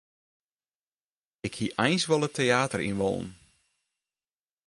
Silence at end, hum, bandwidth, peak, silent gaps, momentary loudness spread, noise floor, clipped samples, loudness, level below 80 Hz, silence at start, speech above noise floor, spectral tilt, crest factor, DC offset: 1.35 s; none; 11.5 kHz; -10 dBFS; none; 13 LU; under -90 dBFS; under 0.1%; -27 LUFS; -60 dBFS; 1.45 s; over 63 dB; -4.5 dB/octave; 22 dB; under 0.1%